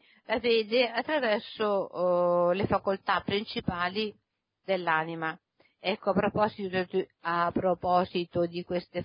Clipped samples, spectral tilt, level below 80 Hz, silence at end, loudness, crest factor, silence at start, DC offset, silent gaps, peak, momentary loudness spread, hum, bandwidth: under 0.1%; -9.5 dB/octave; -58 dBFS; 0 s; -29 LUFS; 18 dB; 0.3 s; under 0.1%; none; -12 dBFS; 8 LU; none; 5.4 kHz